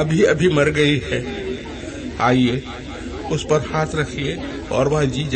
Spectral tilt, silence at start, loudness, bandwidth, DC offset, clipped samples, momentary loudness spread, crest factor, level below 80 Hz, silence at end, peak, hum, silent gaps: -5.5 dB/octave; 0 s; -20 LUFS; 8.8 kHz; under 0.1%; under 0.1%; 14 LU; 16 dB; -38 dBFS; 0 s; -4 dBFS; none; none